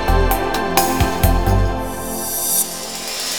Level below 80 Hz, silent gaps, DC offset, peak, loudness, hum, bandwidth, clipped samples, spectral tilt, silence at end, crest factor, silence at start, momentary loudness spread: -22 dBFS; none; 3%; 0 dBFS; -18 LUFS; none; over 20 kHz; under 0.1%; -3.5 dB/octave; 0 s; 18 dB; 0 s; 8 LU